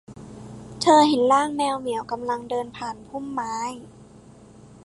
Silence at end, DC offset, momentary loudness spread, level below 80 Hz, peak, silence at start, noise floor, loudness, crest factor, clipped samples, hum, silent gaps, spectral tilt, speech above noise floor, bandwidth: 0.8 s; under 0.1%; 24 LU; -58 dBFS; -4 dBFS; 0.1 s; -48 dBFS; -23 LUFS; 20 dB; under 0.1%; none; none; -4 dB/octave; 26 dB; 11.5 kHz